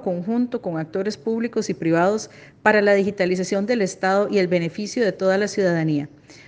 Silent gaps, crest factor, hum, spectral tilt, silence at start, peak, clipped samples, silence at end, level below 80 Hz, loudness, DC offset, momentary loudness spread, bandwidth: none; 20 dB; none; -5.5 dB/octave; 0 s; -2 dBFS; under 0.1%; 0.05 s; -64 dBFS; -21 LUFS; under 0.1%; 8 LU; 9.8 kHz